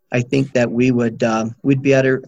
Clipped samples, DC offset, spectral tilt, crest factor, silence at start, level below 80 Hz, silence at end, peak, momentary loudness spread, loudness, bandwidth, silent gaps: under 0.1%; under 0.1%; -7 dB/octave; 16 dB; 0.1 s; -52 dBFS; 0 s; -2 dBFS; 4 LU; -17 LUFS; 8 kHz; none